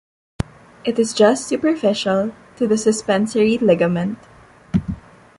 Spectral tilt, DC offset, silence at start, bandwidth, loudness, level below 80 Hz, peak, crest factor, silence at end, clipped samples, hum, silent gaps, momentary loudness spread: -5.5 dB/octave; under 0.1%; 0.4 s; 11.5 kHz; -18 LUFS; -44 dBFS; -2 dBFS; 16 dB; 0.4 s; under 0.1%; none; none; 14 LU